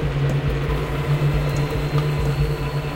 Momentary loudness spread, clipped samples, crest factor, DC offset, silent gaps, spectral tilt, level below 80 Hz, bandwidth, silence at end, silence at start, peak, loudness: 3 LU; under 0.1%; 12 dB; 0.3%; none; -7 dB/octave; -28 dBFS; 16.5 kHz; 0 s; 0 s; -8 dBFS; -22 LUFS